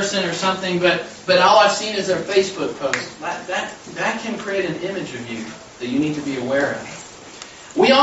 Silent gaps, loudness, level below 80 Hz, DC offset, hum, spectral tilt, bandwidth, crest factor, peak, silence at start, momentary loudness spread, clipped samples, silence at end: none; -20 LUFS; -58 dBFS; under 0.1%; none; -3.5 dB/octave; 8.2 kHz; 18 dB; -2 dBFS; 0 s; 16 LU; under 0.1%; 0 s